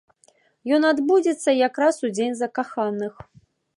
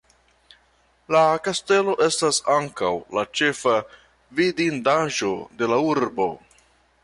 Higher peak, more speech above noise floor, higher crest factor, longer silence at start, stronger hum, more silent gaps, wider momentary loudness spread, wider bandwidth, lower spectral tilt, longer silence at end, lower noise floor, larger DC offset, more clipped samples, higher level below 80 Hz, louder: about the same, -6 dBFS vs -8 dBFS; about the same, 39 dB vs 40 dB; about the same, 16 dB vs 16 dB; second, 0.65 s vs 1.1 s; neither; neither; about the same, 9 LU vs 7 LU; about the same, 11.5 kHz vs 11.5 kHz; about the same, -4.5 dB/octave vs -3.5 dB/octave; about the same, 0.65 s vs 0.65 s; about the same, -61 dBFS vs -61 dBFS; neither; neither; second, -68 dBFS vs -62 dBFS; about the same, -22 LUFS vs -22 LUFS